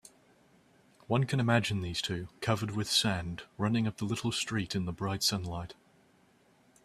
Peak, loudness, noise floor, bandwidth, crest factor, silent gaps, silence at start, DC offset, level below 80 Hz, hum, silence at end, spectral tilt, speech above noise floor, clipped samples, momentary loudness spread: -10 dBFS; -32 LUFS; -65 dBFS; 14.5 kHz; 22 dB; none; 1.1 s; under 0.1%; -60 dBFS; none; 1.15 s; -4.5 dB/octave; 34 dB; under 0.1%; 9 LU